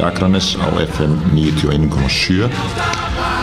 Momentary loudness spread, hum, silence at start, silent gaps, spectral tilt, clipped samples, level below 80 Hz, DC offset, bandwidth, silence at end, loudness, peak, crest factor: 4 LU; none; 0 s; none; -5.5 dB/octave; under 0.1%; -28 dBFS; under 0.1%; 13.5 kHz; 0 s; -16 LUFS; -2 dBFS; 14 dB